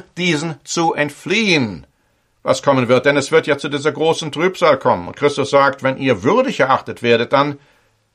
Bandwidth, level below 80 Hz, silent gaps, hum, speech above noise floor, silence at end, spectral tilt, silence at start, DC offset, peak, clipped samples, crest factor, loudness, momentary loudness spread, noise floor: 12.5 kHz; -56 dBFS; none; none; 45 dB; 0.55 s; -4.5 dB/octave; 0.15 s; under 0.1%; 0 dBFS; under 0.1%; 16 dB; -16 LUFS; 7 LU; -61 dBFS